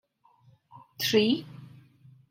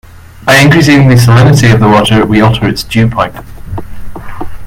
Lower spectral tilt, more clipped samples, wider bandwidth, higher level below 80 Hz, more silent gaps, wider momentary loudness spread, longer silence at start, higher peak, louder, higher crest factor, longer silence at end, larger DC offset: second, -4 dB/octave vs -6 dB/octave; second, under 0.1% vs 0.8%; about the same, 16 kHz vs 16.5 kHz; second, -76 dBFS vs -28 dBFS; neither; first, 25 LU vs 19 LU; first, 0.75 s vs 0.15 s; second, -10 dBFS vs 0 dBFS; second, -26 LUFS vs -6 LUFS; first, 22 dB vs 8 dB; first, 0.65 s vs 0 s; neither